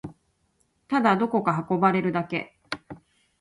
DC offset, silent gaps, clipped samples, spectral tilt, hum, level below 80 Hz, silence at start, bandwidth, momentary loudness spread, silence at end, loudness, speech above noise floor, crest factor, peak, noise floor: under 0.1%; none; under 0.1%; -7.5 dB/octave; none; -64 dBFS; 0.05 s; 11 kHz; 15 LU; 0.45 s; -24 LUFS; 46 dB; 20 dB; -6 dBFS; -70 dBFS